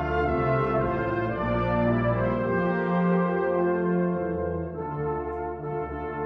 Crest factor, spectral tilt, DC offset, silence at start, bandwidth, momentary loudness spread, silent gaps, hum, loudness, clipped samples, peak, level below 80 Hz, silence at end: 12 dB; -10 dB/octave; under 0.1%; 0 s; 5.2 kHz; 8 LU; none; none; -26 LUFS; under 0.1%; -12 dBFS; -42 dBFS; 0 s